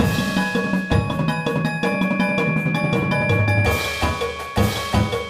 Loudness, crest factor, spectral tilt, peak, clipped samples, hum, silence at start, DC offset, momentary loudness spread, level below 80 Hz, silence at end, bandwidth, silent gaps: -20 LUFS; 16 dB; -6 dB/octave; -4 dBFS; under 0.1%; none; 0 s; under 0.1%; 4 LU; -36 dBFS; 0 s; 15.5 kHz; none